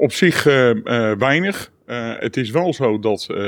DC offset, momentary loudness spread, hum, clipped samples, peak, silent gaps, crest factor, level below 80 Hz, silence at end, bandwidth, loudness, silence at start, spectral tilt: under 0.1%; 12 LU; none; under 0.1%; -2 dBFS; none; 16 dB; -62 dBFS; 0 s; 19.5 kHz; -18 LUFS; 0 s; -5.5 dB/octave